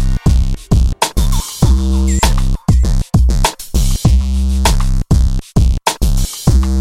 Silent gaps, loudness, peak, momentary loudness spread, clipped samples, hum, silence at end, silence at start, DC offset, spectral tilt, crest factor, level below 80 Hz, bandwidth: none; -15 LUFS; 0 dBFS; 4 LU; under 0.1%; none; 0 s; 0 s; under 0.1%; -5 dB/octave; 12 dB; -14 dBFS; 16 kHz